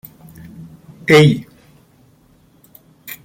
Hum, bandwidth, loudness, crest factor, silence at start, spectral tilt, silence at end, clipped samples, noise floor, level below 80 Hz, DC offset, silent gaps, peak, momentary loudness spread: none; 17 kHz; -13 LUFS; 18 dB; 0.6 s; -6 dB/octave; 1.85 s; under 0.1%; -52 dBFS; -54 dBFS; under 0.1%; none; 0 dBFS; 28 LU